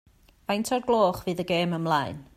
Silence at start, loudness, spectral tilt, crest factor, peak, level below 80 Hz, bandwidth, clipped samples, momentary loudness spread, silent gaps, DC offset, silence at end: 0.5 s; -26 LUFS; -5.5 dB/octave; 16 dB; -10 dBFS; -58 dBFS; 15.5 kHz; under 0.1%; 8 LU; none; under 0.1%; 0.15 s